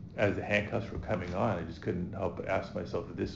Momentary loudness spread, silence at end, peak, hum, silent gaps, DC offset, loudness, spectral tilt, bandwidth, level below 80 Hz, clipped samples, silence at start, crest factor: 6 LU; 0 s; -12 dBFS; none; none; 0.1%; -34 LUFS; -7 dB/octave; 7.8 kHz; -52 dBFS; under 0.1%; 0 s; 20 dB